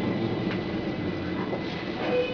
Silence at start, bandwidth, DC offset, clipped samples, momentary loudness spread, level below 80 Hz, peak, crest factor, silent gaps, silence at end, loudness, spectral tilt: 0 s; 5.4 kHz; under 0.1%; under 0.1%; 3 LU; -52 dBFS; -14 dBFS; 14 dB; none; 0 s; -30 LUFS; -7.5 dB/octave